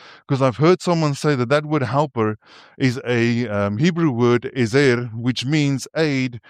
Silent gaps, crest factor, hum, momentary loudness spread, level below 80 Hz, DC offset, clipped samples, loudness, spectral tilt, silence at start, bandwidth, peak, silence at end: none; 16 dB; none; 6 LU; -60 dBFS; under 0.1%; under 0.1%; -19 LUFS; -6.5 dB/octave; 0.05 s; 12.5 kHz; -2 dBFS; 0.1 s